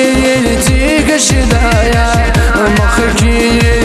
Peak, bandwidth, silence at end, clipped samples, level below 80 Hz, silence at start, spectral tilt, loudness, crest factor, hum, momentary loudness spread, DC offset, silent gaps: 0 dBFS; 13 kHz; 0 s; under 0.1%; -14 dBFS; 0 s; -4.5 dB/octave; -10 LUFS; 8 dB; none; 1 LU; under 0.1%; none